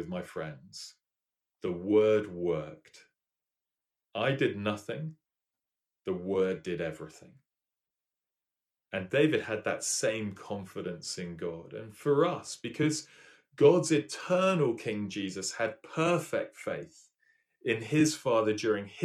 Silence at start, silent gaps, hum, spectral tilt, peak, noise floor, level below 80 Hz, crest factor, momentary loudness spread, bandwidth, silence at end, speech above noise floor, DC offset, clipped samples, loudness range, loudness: 0 s; none; none; -5 dB/octave; -10 dBFS; under -90 dBFS; -70 dBFS; 22 dB; 14 LU; 13.5 kHz; 0 s; over 59 dB; under 0.1%; under 0.1%; 8 LU; -31 LUFS